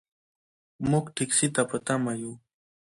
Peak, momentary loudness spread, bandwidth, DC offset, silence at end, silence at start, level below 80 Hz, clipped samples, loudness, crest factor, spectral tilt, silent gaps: -8 dBFS; 10 LU; 11.5 kHz; under 0.1%; 0.55 s; 0.8 s; -60 dBFS; under 0.1%; -27 LUFS; 20 dB; -4 dB/octave; none